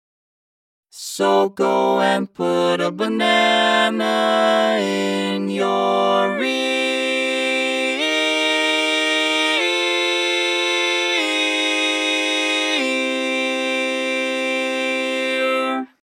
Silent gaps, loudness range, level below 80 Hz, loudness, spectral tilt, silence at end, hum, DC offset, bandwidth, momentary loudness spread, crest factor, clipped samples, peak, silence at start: none; 2 LU; -80 dBFS; -18 LUFS; -2.5 dB/octave; 0.2 s; none; under 0.1%; 16.5 kHz; 4 LU; 16 dB; under 0.1%; -4 dBFS; 0.95 s